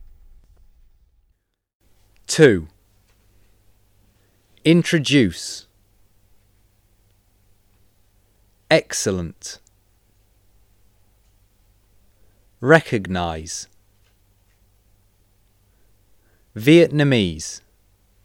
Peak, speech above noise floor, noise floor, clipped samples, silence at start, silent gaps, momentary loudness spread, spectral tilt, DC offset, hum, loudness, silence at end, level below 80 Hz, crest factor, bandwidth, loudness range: 0 dBFS; 51 dB; -68 dBFS; under 0.1%; 0 s; 1.75-1.80 s; 21 LU; -5 dB/octave; under 0.1%; none; -18 LUFS; 0.65 s; -52 dBFS; 24 dB; 16.5 kHz; 10 LU